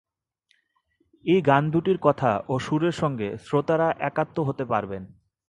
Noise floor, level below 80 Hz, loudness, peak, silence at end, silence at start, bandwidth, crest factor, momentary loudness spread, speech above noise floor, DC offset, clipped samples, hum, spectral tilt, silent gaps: -70 dBFS; -58 dBFS; -24 LUFS; -4 dBFS; 0.45 s; 1.25 s; 11 kHz; 22 dB; 7 LU; 47 dB; under 0.1%; under 0.1%; none; -7.5 dB/octave; none